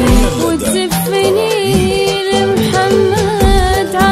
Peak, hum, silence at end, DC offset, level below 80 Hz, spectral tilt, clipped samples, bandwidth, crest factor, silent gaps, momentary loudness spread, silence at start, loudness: 0 dBFS; none; 0 s; under 0.1%; -20 dBFS; -5 dB/octave; under 0.1%; 16 kHz; 12 dB; none; 3 LU; 0 s; -12 LUFS